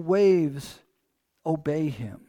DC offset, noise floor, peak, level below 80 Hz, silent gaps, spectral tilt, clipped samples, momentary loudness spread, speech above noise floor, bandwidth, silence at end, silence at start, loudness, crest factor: under 0.1%; -75 dBFS; -10 dBFS; -62 dBFS; none; -7.5 dB/octave; under 0.1%; 17 LU; 51 dB; 15 kHz; 0.15 s; 0 s; -25 LUFS; 14 dB